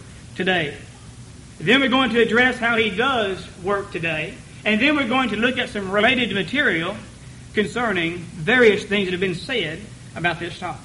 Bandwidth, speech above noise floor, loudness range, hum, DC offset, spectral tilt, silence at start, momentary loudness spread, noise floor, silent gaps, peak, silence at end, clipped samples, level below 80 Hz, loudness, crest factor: 11.5 kHz; 20 dB; 2 LU; none; under 0.1%; -5 dB/octave; 0 s; 13 LU; -41 dBFS; none; -4 dBFS; 0 s; under 0.1%; -48 dBFS; -20 LUFS; 18 dB